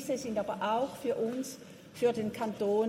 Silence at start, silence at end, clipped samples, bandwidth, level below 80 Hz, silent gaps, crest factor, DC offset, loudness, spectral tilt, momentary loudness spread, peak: 0 s; 0 s; under 0.1%; 16 kHz; -70 dBFS; none; 16 dB; under 0.1%; -33 LUFS; -5 dB/octave; 10 LU; -18 dBFS